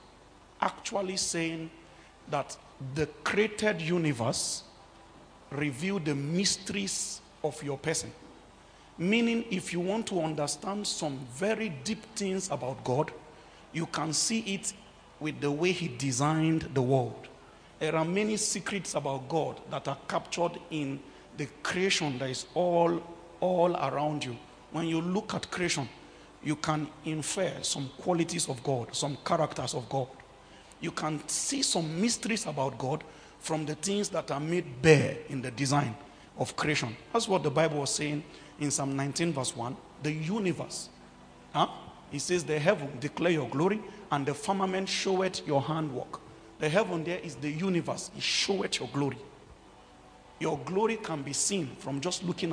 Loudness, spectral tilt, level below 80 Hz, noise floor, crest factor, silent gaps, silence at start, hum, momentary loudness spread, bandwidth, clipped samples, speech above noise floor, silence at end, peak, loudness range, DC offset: -31 LUFS; -4 dB/octave; -62 dBFS; -56 dBFS; 26 dB; none; 0 s; none; 10 LU; 10.5 kHz; under 0.1%; 25 dB; 0 s; -6 dBFS; 4 LU; under 0.1%